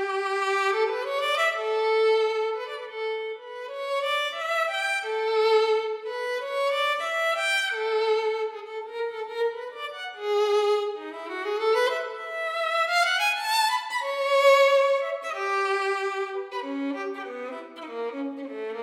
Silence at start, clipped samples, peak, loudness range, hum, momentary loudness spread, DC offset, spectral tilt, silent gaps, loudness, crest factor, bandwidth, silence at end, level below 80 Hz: 0 s; under 0.1%; -8 dBFS; 6 LU; none; 12 LU; under 0.1%; 0 dB/octave; none; -25 LUFS; 18 dB; 16 kHz; 0 s; under -90 dBFS